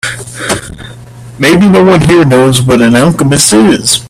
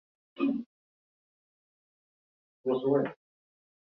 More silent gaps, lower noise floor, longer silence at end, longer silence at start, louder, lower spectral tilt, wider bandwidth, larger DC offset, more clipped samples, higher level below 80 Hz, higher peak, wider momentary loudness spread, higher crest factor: second, none vs 0.66-2.64 s; second, -28 dBFS vs under -90 dBFS; second, 0 s vs 0.75 s; second, 0.05 s vs 0.4 s; first, -6 LUFS vs -31 LUFS; second, -4.5 dB/octave vs -10 dB/octave; first, over 20 kHz vs 4.3 kHz; neither; first, 0.2% vs under 0.1%; first, -34 dBFS vs -80 dBFS; first, 0 dBFS vs -14 dBFS; about the same, 12 LU vs 10 LU; second, 8 dB vs 22 dB